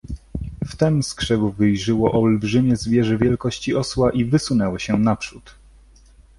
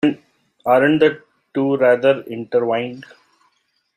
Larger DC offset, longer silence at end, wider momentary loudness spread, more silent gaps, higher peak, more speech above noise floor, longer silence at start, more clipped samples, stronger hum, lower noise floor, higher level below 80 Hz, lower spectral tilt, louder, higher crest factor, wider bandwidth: neither; about the same, 0.9 s vs 0.95 s; second, 11 LU vs 17 LU; neither; about the same, -2 dBFS vs -2 dBFS; second, 30 dB vs 49 dB; about the same, 0.05 s vs 0.05 s; neither; neither; second, -49 dBFS vs -66 dBFS; first, -40 dBFS vs -62 dBFS; about the same, -6.5 dB/octave vs -7.5 dB/octave; second, -20 LUFS vs -17 LUFS; about the same, 18 dB vs 16 dB; second, 11.5 kHz vs 14.5 kHz